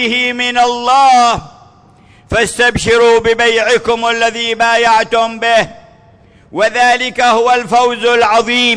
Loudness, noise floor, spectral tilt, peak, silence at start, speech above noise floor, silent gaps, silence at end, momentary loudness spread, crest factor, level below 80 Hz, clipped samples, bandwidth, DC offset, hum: -11 LUFS; -44 dBFS; -2.5 dB/octave; -2 dBFS; 0 s; 33 dB; none; 0 s; 5 LU; 10 dB; -40 dBFS; under 0.1%; 11 kHz; under 0.1%; none